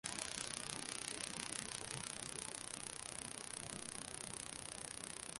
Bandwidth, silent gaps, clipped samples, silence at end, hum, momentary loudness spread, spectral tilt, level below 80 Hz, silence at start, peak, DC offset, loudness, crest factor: 12 kHz; none; under 0.1%; 0 s; none; 4 LU; -1.5 dB/octave; -70 dBFS; 0.05 s; -18 dBFS; under 0.1%; -45 LUFS; 30 dB